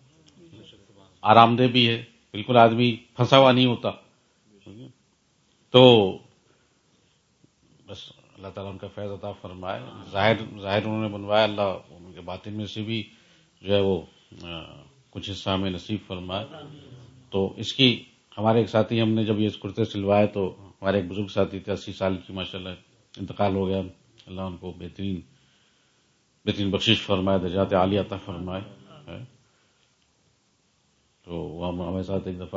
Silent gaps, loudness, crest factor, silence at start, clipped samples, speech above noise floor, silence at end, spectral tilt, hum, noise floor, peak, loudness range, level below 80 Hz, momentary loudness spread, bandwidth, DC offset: none; -23 LUFS; 26 dB; 0.55 s; under 0.1%; 43 dB; 0 s; -6.5 dB/octave; none; -67 dBFS; 0 dBFS; 14 LU; -60 dBFS; 22 LU; 7.8 kHz; under 0.1%